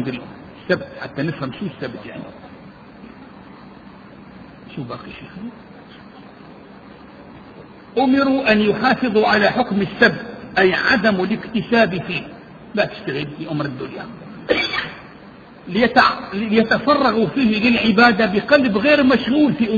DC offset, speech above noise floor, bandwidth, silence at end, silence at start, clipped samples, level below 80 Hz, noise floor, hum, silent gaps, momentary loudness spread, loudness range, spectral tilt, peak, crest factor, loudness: under 0.1%; 24 dB; 7 kHz; 0 s; 0 s; under 0.1%; -50 dBFS; -41 dBFS; none; none; 19 LU; 21 LU; -7 dB/octave; 0 dBFS; 20 dB; -17 LUFS